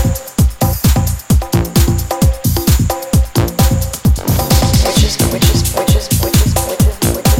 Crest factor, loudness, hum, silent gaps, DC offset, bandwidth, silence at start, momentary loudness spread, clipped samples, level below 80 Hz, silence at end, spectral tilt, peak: 12 dB; -13 LUFS; none; none; under 0.1%; 17.5 kHz; 0 s; 3 LU; under 0.1%; -16 dBFS; 0 s; -5 dB/octave; 0 dBFS